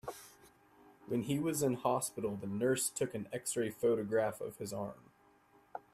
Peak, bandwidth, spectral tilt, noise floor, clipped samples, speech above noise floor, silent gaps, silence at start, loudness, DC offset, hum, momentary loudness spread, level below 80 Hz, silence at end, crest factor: -18 dBFS; 15.5 kHz; -4.5 dB/octave; -67 dBFS; under 0.1%; 31 dB; none; 0.05 s; -36 LUFS; under 0.1%; none; 14 LU; -72 dBFS; 0.15 s; 20 dB